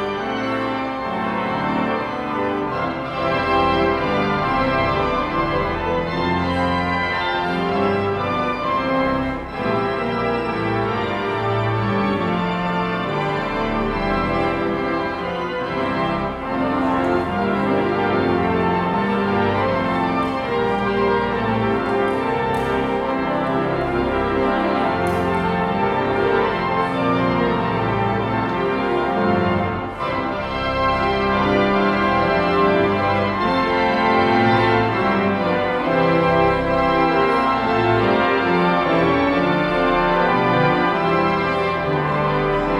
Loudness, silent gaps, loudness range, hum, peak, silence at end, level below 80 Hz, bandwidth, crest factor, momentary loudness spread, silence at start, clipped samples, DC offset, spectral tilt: -19 LUFS; none; 4 LU; none; -4 dBFS; 0 s; -40 dBFS; 12.5 kHz; 16 dB; 5 LU; 0 s; under 0.1%; under 0.1%; -7 dB/octave